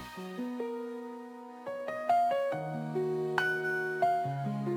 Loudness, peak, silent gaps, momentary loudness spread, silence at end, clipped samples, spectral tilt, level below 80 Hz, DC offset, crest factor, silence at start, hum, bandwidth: -33 LUFS; -12 dBFS; none; 13 LU; 0 s; under 0.1%; -6.5 dB/octave; -76 dBFS; under 0.1%; 20 dB; 0 s; none; 19.5 kHz